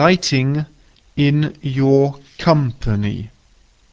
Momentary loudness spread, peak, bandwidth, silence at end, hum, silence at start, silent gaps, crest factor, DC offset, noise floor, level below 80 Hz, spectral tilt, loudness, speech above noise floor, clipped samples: 14 LU; 0 dBFS; 8 kHz; 0.65 s; none; 0 s; none; 18 dB; under 0.1%; -53 dBFS; -40 dBFS; -6.5 dB/octave; -18 LUFS; 37 dB; under 0.1%